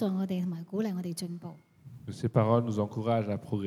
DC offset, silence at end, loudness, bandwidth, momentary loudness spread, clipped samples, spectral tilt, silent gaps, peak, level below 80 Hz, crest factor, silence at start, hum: under 0.1%; 0 s; -31 LUFS; 14.5 kHz; 17 LU; under 0.1%; -7.5 dB/octave; none; -12 dBFS; -70 dBFS; 18 dB; 0 s; none